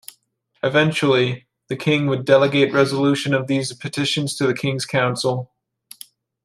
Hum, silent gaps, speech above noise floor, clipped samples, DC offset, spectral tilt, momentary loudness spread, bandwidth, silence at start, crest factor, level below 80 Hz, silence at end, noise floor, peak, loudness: none; none; 46 dB; under 0.1%; under 0.1%; -5 dB/octave; 14 LU; 15.5 kHz; 0.65 s; 18 dB; -62 dBFS; 1 s; -65 dBFS; -2 dBFS; -19 LUFS